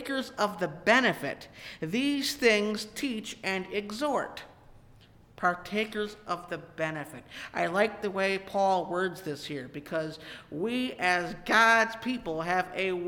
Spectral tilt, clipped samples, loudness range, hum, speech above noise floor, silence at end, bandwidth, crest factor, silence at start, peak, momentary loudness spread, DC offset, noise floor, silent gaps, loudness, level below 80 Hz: -4 dB/octave; under 0.1%; 6 LU; none; 26 dB; 0 s; 19 kHz; 20 dB; 0 s; -10 dBFS; 15 LU; under 0.1%; -56 dBFS; none; -29 LUFS; -62 dBFS